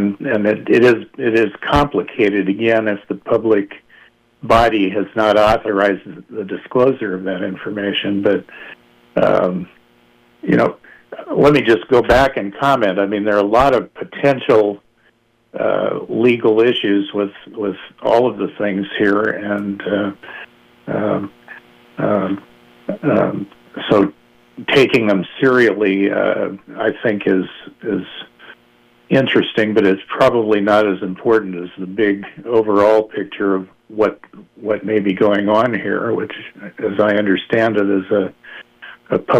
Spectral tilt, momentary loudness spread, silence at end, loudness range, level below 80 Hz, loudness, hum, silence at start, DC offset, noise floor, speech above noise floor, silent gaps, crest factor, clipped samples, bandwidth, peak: -7 dB/octave; 15 LU; 0 s; 5 LU; -42 dBFS; -16 LUFS; none; 0 s; under 0.1%; -57 dBFS; 41 dB; none; 14 dB; under 0.1%; 13 kHz; -2 dBFS